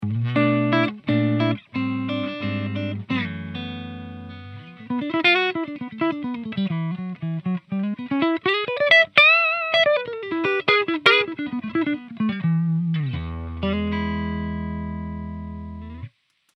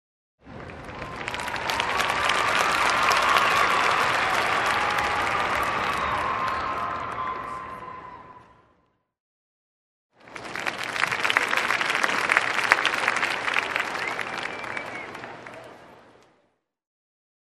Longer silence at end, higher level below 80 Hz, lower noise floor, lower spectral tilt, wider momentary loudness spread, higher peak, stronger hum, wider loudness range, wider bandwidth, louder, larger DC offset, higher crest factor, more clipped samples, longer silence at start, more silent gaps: second, 0.5 s vs 1.55 s; first, -46 dBFS vs -54 dBFS; second, -44 dBFS vs -70 dBFS; first, -7 dB/octave vs -2 dB/octave; about the same, 17 LU vs 18 LU; about the same, 0 dBFS vs 0 dBFS; neither; second, 11 LU vs 14 LU; second, 9 kHz vs 13 kHz; about the same, -21 LUFS vs -23 LUFS; neither; about the same, 22 dB vs 26 dB; neither; second, 0 s vs 0.45 s; second, none vs 9.20-10.10 s